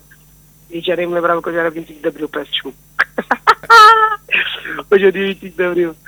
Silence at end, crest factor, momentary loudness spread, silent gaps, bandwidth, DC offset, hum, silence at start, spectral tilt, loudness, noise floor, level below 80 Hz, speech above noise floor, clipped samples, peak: 0.15 s; 14 dB; 17 LU; none; over 20 kHz; under 0.1%; 50 Hz at -50 dBFS; 0.7 s; -4 dB/octave; -13 LUFS; -46 dBFS; -52 dBFS; 29 dB; 0.5%; 0 dBFS